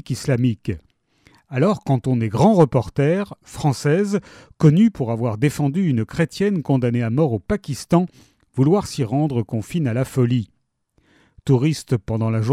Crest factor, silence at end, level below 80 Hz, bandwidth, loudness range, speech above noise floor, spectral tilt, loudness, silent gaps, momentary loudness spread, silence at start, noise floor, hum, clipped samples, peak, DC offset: 16 dB; 0 s; -48 dBFS; 14 kHz; 4 LU; 46 dB; -7.5 dB/octave; -20 LUFS; none; 9 LU; 0.1 s; -65 dBFS; none; under 0.1%; -2 dBFS; under 0.1%